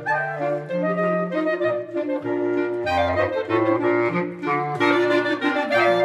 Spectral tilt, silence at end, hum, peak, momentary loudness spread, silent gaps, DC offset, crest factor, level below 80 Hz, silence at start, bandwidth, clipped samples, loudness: -6.5 dB/octave; 0 s; none; -6 dBFS; 6 LU; none; under 0.1%; 14 dB; -56 dBFS; 0 s; 11.5 kHz; under 0.1%; -22 LUFS